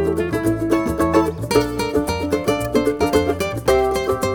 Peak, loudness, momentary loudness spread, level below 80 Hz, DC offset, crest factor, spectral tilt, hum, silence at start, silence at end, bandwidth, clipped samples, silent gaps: -2 dBFS; -19 LUFS; 3 LU; -36 dBFS; under 0.1%; 16 dB; -5.5 dB/octave; none; 0 s; 0 s; over 20 kHz; under 0.1%; none